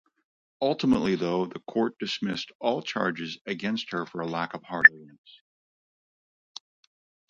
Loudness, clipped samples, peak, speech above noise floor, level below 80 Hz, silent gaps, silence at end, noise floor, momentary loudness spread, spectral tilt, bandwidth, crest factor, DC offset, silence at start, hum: -26 LUFS; under 0.1%; 0 dBFS; over 63 dB; -64 dBFS; 2.55-2.60 s, 3.41-3.45 s; 2.25 s; under -90 dBFS; 16 LU; -5 dB/octave; 7.8 kHz; 28 dB; under 0.1%; 0.6 s; none